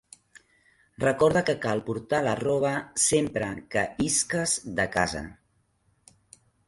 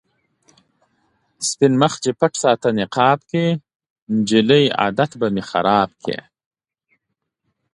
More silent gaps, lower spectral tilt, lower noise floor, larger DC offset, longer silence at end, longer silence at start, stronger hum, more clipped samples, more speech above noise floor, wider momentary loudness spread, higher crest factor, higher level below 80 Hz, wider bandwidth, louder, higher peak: second, none vs 3.75-3.80 s, 3.90-3.96 s, 4.02-4.07 s; second, -3.5 dB/octave vs -5 dB/octave; second, -69 dBFS vs -77 dBFS; neither; second, 1.35 s vs 1.55 s; second, 1 s vs 1.4 s; neither; neither; second, 43 dB vs 59 dB; about the same, 7 LU vs 9 LU; about the same, 20 dB vs 20 dB; about the same, -54 dBFS vs -58 dBFS; about the same, 11.5 kHz vs 11.5 kHz; second, -26 LUFS vs -18 LUFS; second, -8 dBFS vs 0 dBFS